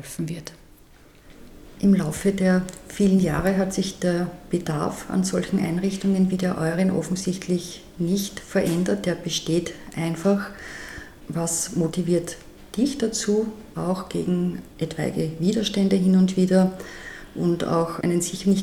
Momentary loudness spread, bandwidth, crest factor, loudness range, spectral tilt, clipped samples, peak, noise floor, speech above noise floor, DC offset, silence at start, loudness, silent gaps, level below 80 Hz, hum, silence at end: 13 LU; 14.5 kHz; 18 dB; 4 LU; -5.5 dB/octave; under 0.1%; -6 dBFS; -50 dBFS; 28 dB; under 0.1%; 0 s; -24 LUFS; none; -48 dBFS; none; 0 s